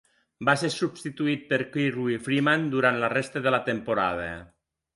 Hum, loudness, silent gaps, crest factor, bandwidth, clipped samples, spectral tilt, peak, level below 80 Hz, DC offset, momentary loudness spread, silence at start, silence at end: none; -26 LUFS; none; 20 dB; 11.5 kHz; under 0.1%; -5.5 dB/octave; -6 dBFS; -60 dBFS; under 0.1%; 7 LU; 0.4 s; 0.5 s